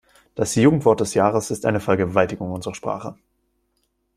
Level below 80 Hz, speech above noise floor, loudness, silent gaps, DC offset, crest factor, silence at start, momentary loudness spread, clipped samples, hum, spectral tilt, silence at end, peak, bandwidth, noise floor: -54 dBFS; 50 dB; -20 LUFS; none; under 0.1%; 20 dB; 0.35 s; 12 LU; under 0.1%; none; -6 dB/octave; 1.05 s; -2 dBFS; 14.5 kHz; -70 dBFS